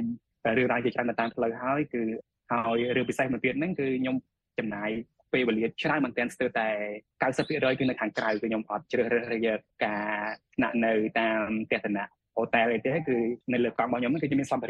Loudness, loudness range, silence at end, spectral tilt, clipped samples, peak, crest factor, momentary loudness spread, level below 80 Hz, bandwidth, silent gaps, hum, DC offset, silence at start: -29 LUFS; 2 LU; 0 s; -6.5 dB/octave; under 0.1%; -10 dBFS; 18 dB; 7 LU; -64 dBFS; 9.6 kHz; none; none; under 0.1%; 0 s